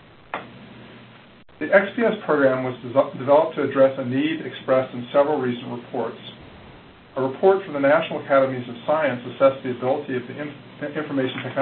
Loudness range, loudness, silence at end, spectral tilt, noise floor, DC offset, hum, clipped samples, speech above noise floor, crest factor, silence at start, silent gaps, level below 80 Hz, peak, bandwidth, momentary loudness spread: 4 LU; -22 LUFS; 0 s; -11 dB/octave; -46 dBFS; under 0.1%; none; under 0.1%; 25 dB; 22 dB; 0.35 s; none; -62 dBFS; -2 dBFS; 4.4 kHz; 15 LU